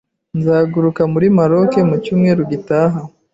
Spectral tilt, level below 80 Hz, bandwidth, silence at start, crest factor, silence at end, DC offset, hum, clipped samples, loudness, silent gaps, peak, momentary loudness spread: -9.5 dB/octave; -52 dBFS; 7.8 kHz; 0.35 s; 12 dB; 0.25 s; under 0.1%; none; under 0.1%; -14 LUFS; none; -2 dBFS; 6 LU